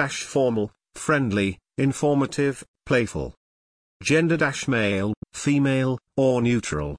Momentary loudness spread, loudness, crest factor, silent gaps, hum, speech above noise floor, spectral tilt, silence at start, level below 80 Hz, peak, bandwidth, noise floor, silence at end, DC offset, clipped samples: 8 LU; -23 LUFS; 16 dB; 2.68-2.74 s, 3.37-4.00 s, 5.17-5.22 s; none; over 67 dB; -5.5 dB/octave; 0 s; -48 dBFS; -8 dBFS; 10.5 kHz; under -90 dBFS; 0 s; under 0.1%; under 0.1%